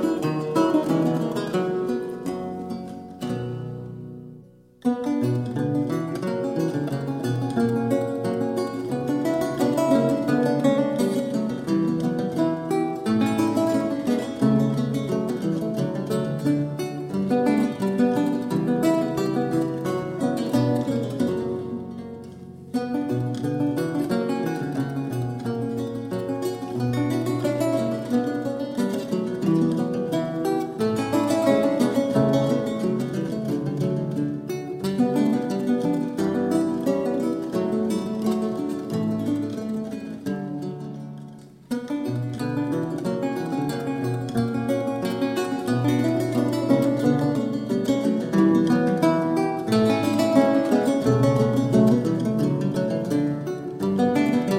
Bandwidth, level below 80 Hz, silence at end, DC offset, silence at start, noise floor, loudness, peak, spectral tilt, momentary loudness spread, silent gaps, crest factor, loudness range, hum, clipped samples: 16.5 kHz; -58 dBFS; 0 s; under 0.1%; 0 s; -48 dBFS; -24 LUFS; -4 dBFS; -7 dB/octave; 9 LU; none; 18 dB; 7 LU; none; under 0.1%